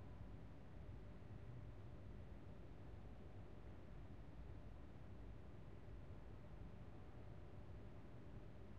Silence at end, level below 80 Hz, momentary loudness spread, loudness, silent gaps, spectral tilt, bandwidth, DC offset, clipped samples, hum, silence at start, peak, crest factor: 0 s; -62 dBFS; 2 LU; -60 LUFS; none; -7.5 dB/octave; 7.2 kHz; 0.1%; under 0.1%; none; 0 s; -44 dBFS; 12 dB